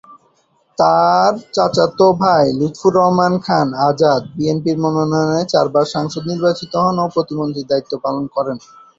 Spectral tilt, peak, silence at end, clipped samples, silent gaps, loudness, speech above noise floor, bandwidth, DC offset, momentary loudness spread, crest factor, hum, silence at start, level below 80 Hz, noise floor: -6.5 dB/octave; 0 dBFS; 0.4 s; under 0.1%; none; -16 LUFS; 44 dB; 7.8 kHz; under 0.1%; 8 LU; 14 dB; none; 0.1 s; -54 dBFS; -59 dBFS